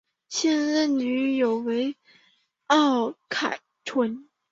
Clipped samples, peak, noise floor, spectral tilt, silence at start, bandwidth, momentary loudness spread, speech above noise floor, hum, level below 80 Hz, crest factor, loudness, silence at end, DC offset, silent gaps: under 0.1%; -6 dBFS; -65 dBFS; -3 dB/octave; 0.3 s; 7.8 kHz; 10 LU; 41 dB; none; -74 dBFS; 18 dB; -25 LUFS; 0.3 s; under 0.1%; none